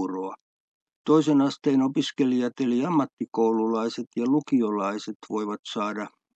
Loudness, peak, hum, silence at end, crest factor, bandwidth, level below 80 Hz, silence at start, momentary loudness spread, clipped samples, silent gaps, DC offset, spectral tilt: -25 LUFS; -8 dBFS; none; 0.25 s; 18 dB; 8.2 kHz; -80 dBFS; 0 s; 9 LU; under 0.1%; 0.41-0.87 s, 0.96-1.05 s, 3.13-3.17 s, 4.07-4.11 s, 5.15-5.20 s, 5.59-5.63 s; under 0.1%; -6 dB/octave